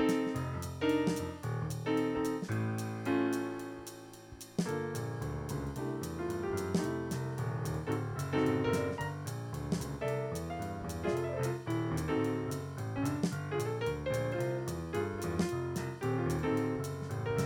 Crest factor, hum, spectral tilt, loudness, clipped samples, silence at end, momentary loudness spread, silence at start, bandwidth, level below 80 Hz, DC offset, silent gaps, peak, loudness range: 16 dB; none; -6.5 dB/octave; -35 LUFS; under 0.1%; 0 s; 7 LU; 0 s; 18 kHz; -54 dBFS; under 0.1%; none; -18 dBFS; 3 LU